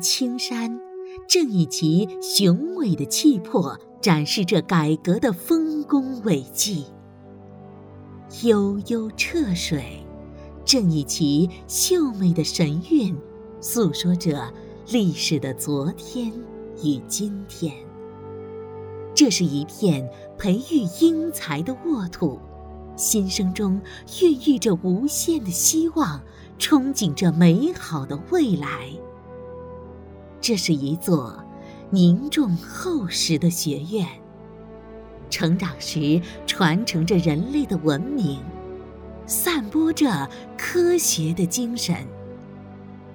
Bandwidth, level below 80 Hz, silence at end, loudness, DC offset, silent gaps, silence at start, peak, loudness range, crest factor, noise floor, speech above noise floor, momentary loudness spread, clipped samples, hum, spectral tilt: over 20 kHz; -50 dBFS; 0 s; -22 LUFS; under 0.1%; none; 0 s; -2 dBFS; 5 LU; 20 dB; -44 dBFS; 22 dB; 20 LU; under 0.1%; none; -4.5 dB/octave